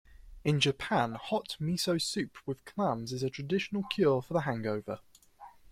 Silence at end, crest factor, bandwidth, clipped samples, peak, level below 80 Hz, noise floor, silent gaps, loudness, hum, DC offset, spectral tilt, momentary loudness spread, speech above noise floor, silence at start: 0.2 s; 20 dB; 15.5 kHz; under 0.1%; -12 dBFS; -60 dBFS; -55 dBFS; none; -32 LUFS; none; under 0.1%; -5 dB/octave; 10 LU; 23 dB; 0.1 s